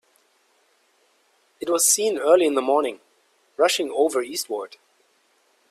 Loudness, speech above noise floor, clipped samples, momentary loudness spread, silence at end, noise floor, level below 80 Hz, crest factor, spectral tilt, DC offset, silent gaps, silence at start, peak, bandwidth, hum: -21 LUFS; 43 dB; under 0.1%; 14 LU; 1.05 s; -64 dBFS; -74 dBFS; 20 dB; -1 dB/octave; under 0.1%; none; 1.6 s; -4 dBFS; 16 kHz; none